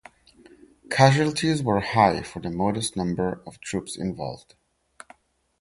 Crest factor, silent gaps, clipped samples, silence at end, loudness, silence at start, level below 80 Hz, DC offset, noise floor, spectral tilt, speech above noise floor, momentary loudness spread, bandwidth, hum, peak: 22 dB; none; under 0.1%; 1.25 s; -24 LUFS; 0.9 s; -52 dBFS; under 0.1%; -55 dBFS; -5.5 dB/octave; 32 dB; 15 LU; 11.5 kHz; none; -2 dBFS